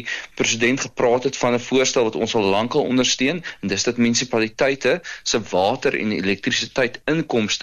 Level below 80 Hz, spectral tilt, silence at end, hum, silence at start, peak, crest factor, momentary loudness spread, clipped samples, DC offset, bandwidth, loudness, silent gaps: -54 dBFS; -3.5 dB/octave; 0 s; none; 0 s; -6 dBFS; 14 dB; 4 LU; under 0.1%; under 0.1%; 12 kHz; -20 LUFS; none